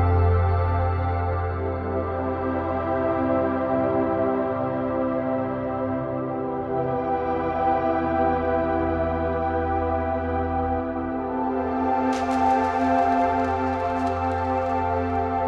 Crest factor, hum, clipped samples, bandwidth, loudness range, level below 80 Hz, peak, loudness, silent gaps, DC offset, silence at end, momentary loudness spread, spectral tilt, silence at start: 14 dB; none; under 0.1%; 7.8 kHz; 2 LU; -38 dBFS; -10 dBFS; -24 LUFS; none; under 0.1%; 0 s; 6 LU; -8.5 dB/octave; 0 s